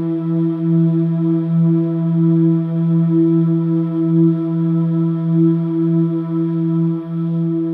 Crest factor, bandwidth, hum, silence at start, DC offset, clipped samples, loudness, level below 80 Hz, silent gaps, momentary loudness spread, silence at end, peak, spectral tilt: 10 dB; 3.6 kHz; none; 0 s; under 0.1%; under 0.1%; -16 LUFS; -68 dBFS; none; 4 LU; 0 s; -4 dBFS; -13 dB/octave